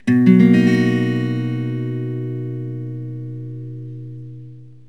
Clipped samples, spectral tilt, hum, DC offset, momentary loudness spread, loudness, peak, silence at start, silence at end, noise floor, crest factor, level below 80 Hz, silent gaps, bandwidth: under 0.1%; -8.5 dB/octave; none; 0.5%; 22 LU; -18 LUFS; 0 dBFS; 0.05 s; 0.15 s; -39 dBFS; 18 dB; -68 dBFS; none; 9 kHz